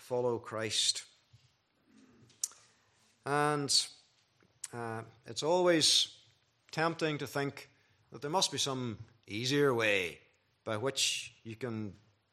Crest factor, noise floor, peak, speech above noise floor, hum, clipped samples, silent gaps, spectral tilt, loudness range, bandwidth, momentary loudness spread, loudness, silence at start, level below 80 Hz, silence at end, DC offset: 20 dB; -71 dBFS; -14 dBFS; 38 dB; none; under 0.1%; none; -2.5 dB/octave; 5 LU; 14.5 kHz; 16 LU; -32 LUFS; 0 s; -78 dBFS; 0.4 s; under 0.1%